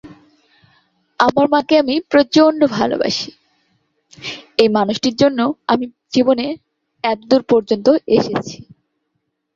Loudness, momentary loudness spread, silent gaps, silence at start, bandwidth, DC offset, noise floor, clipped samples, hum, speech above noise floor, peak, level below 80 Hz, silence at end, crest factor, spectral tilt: -16 LUFS; 13 LU; none; 0.05 s; 7.6 kHz; under 0.1%; -72 dBFS; under 0.1%; none; 57 dB; 0 dBFS; -56 dBFS; 1 s; 16 dB; -5 dB/octave